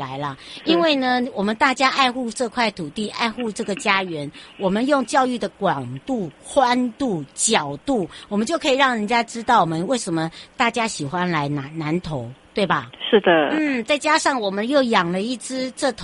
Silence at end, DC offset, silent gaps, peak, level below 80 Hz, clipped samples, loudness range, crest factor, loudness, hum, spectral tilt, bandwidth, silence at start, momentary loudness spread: 0 s; under 0.1%; none; -2 dBFS; -56 dBFS; under 0.1%; 3 LU; 18 dB; -21 LUFS; none; -4 dB/octave; 11.5 kHz; 0 s; 10 LU